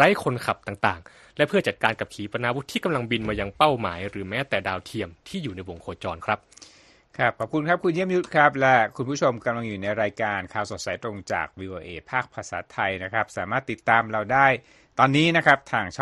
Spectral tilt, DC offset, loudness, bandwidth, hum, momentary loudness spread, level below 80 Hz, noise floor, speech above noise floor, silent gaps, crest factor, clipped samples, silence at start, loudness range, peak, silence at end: -5 dB/octave; under 0.1%; -24 LUFS; 12.5 kHz; none; 14 LU; -54 dBFS; -53 dBFS; 29 dB; none; 22 dB; under 0.1%; 0 s; 7 LU; -2 dBFS; 0 s